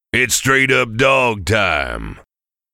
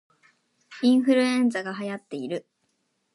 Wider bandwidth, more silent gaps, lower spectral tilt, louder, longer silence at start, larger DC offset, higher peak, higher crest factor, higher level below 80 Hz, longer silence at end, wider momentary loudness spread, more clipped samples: first, 17.5 kHz vs 11.5 kHz; neither; second, -3.5 dB/octave vs -5 dB/octave; first, -15 LUFS vs -24 LUFS; second, 0.15 s vs 0.7 s; neither; first, -2 dBFS vs -10 dBFS; about the same, 16 dB vs 16 dB; first, -38 dBFS vs -82 dBFS; second, 0.55 s vs 0.75 s; about the same, 12 LU vs 14 LU; neither